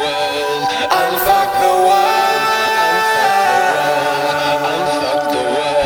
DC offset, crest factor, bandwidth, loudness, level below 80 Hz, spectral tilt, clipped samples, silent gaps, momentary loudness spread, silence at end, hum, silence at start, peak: under 0.1%; 14 dB; 19 kHz; -14 LUFS; -48 dBFS; -2.5 dB/octave; under 0.1%; none; 5 LU; 0 s; none; 0 s; -2 dBFS